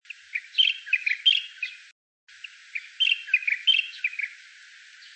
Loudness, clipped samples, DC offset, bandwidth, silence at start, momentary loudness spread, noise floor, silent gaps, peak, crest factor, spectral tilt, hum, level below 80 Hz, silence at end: -23 LUFS; under 0.1%; under 0.1%; 8.8 kHz; 0.35 s; 16 LU; -50 dBFS; 1.92-2.27 s; -10 dBFS; 20 dB; 10 dB/octave; none; under -90 dBFS; 0.05 s